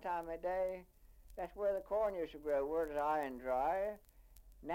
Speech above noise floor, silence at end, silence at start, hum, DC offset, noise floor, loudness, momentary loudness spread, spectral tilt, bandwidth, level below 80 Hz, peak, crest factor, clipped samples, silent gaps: 23 dB; 0 s; 0 s; none; under 0.1%; -61 dBFS; -39 LUFS; 12 LU; -6 dB/octave; 16.5 kHz; -62 dBFS; -26 dBFS; 14 dB; under 0.1%; none